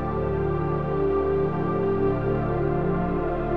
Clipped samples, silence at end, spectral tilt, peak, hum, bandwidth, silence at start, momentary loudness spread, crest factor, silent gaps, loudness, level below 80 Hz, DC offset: under 0.1%; 0 s; -11 dB/octave; -12 dBFS; none; 4.9 kHz; 0 s; 2 LU; 12 dB; none; -25 LUFS; -38 dBFS; 1%